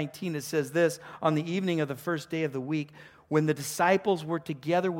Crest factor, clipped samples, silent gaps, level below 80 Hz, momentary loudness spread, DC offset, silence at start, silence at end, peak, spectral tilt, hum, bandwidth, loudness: 18 dB; under 0.1%; none; -72 dBFS; 8 LU; under 0.1%; 0 s; 0 s; -10 dBFS; -5.5 dB/octave; none; 17 kHz; -29 LUFS